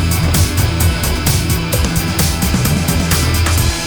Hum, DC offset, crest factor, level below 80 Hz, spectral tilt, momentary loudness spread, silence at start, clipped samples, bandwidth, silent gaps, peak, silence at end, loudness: none; under 0.1%; 12 dB; -20 dBFS; -4 dB/octave; 2 LU; 0 s; under 0.1%; over 20 kHz; none; -2 dBFS; 0 s; -14 LUFS